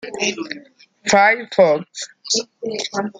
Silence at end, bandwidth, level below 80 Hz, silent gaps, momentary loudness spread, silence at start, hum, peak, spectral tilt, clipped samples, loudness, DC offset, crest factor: 0.1 s; 9.6 kHz; -64 dBFS; none; 17 LU; 0.05 s; none; -2 dBFS; -2.5 dB/octave; under 0.1%; -18 LUFS; under 0.1%; 18 dB